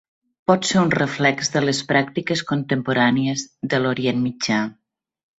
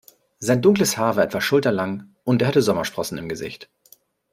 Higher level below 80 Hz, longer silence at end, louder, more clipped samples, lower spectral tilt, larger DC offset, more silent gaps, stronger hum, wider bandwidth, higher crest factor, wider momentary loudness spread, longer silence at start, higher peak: about the same, -58 dBFS vs -58 dBFS; about the same, 0.65 s vs 0.7 s; about the same, -20 LUFS vs -21 LUFS; neither; about the same, -4.5 dB/octave vs -5 dB/octave; neither; neither; neither; second, 8.2 kHz vs 16 kHz; about the same, 18 dB vs 18 dB; second, 6 LU vs 13 LU; about the same, 0.5 s vs 0.4 s; about the same, -2 dBFS vs -4 dBFS